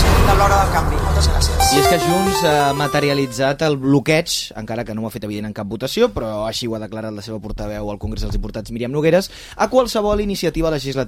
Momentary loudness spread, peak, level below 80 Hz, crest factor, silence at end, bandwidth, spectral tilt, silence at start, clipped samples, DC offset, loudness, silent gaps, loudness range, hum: 13 LU; -2 dBFS; -26 dBFS; 14 dB; 0 s; 16.5 kHz; -5 dB/octave; 0 s; under 0.1%; under 0.1%; -18 LUFS; none; 8 LU; none